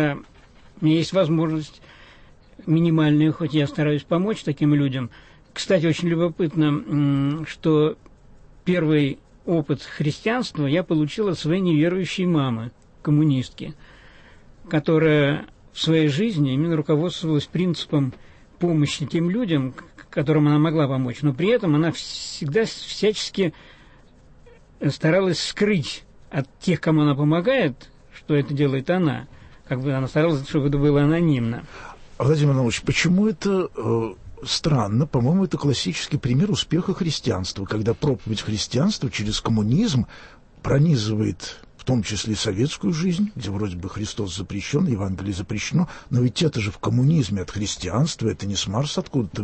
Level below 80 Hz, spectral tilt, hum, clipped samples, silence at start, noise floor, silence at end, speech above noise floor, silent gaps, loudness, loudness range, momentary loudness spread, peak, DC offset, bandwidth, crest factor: -46 dBFS; -6 dB/octave; none; under 0.1%; 0 s; -50 dBFS; 0 s; 28 dB; none; -22 LUFS; 3 LU; 10 LU; -8 dBFS; under 0.1%; 8.8 kHz; 14 dB